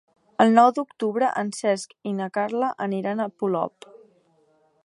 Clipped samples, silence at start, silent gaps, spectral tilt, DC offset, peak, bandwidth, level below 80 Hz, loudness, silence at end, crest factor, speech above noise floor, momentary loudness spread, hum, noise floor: under 0.1%; 0.4 s; none; -5.5 dB/octave; under 0.1%; -2 dBFS; 11.5 kHz; -76 dBFS; -23 LUFS; 1.15 s; 22 dB; 40 dB; 11 LU; none; -63 dBFS